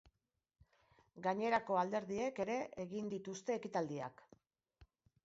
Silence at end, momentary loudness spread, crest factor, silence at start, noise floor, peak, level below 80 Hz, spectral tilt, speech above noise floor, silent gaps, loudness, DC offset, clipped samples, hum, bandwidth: 0.4 s; 9 LU; 20 dB; 1.15 s; -78 dBFS; -22 dBFS; -76 dBFS; -4.5 dB/octave; 38 dB; none; -40 LUFS; under 0.1%; under 0.1%; none; 7.6 kHz